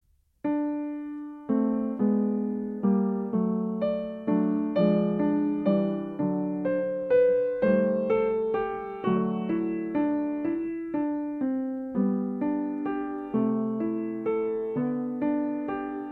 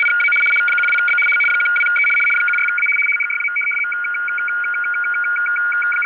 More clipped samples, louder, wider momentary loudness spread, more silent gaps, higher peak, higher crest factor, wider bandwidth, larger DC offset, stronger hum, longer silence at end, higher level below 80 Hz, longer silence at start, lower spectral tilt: neither; second, -27 LUFS vs -15 LUFS; about the same, 7 LU vs 6 LU; neither; about the same, -12 dBFS vs -10 dBFS; first, 16 dB vs 8 dB; first, 4.5 kHz vs 4 kHz; neither; neither; about the same, 0 s vs 0 s; first, -62 dBFS vs -82 dBFS; first, 0.45 s vs 0 s; first, -11 dB/octave vs -1 dB/octave